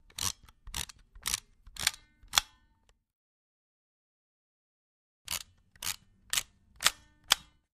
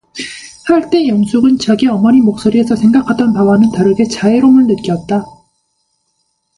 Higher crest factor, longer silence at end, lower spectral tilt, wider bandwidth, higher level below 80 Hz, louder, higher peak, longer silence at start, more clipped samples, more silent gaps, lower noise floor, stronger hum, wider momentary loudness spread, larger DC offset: first, 36 dB vs 12 dB; second, 0.3 s vs 1.35 s; second, 1 dB/octave vs -6.5 dB/octave; first, 15.5 kHz vs 11 kHz; second, -58 dBFS vs -48 dBFS; second, -33 LUFS vs -11 LUFS; about the same, -2 dBFS vs 0 dBFS; about the same, 0.15 s vs 0.15 s; neither; first, 3.15-5.25 s vs none; first, -69 dBFS vs -64 dBFS; neither; first, 19 LU vs 9 LU; neither